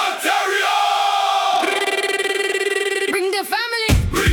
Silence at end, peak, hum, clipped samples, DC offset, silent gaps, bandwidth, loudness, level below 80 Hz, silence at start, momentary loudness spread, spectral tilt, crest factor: 0 s; -4 dBFS; none; under 0.1%; under 0.1%; none; 18 kHz; -18 LUFS; -32 dBFS; 0 s; 3 LU; -3.5 dB/octave; 14 dB